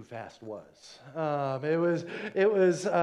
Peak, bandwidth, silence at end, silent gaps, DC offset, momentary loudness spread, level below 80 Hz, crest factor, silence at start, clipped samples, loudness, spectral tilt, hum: -14 dBFS; 11 kHz; 0 s; none; under 0.1%; 19 LU; -78 dBFS; 16 dB; 0 s; under 0.1%; -28 LUFS; -6.5 dB/octave; none